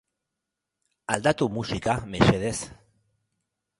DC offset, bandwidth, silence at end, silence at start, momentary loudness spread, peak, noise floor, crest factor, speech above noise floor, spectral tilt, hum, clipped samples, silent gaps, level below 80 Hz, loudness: under 0.1%; 11.5 kHz; 1.05 s; 1.1 s; 13 LU; -2 dBFS; -85 dBFS; 26 dB; 60 dB; -5 dB/octave; none; under 0.1%; none; -48 dBFS; -25 LUFS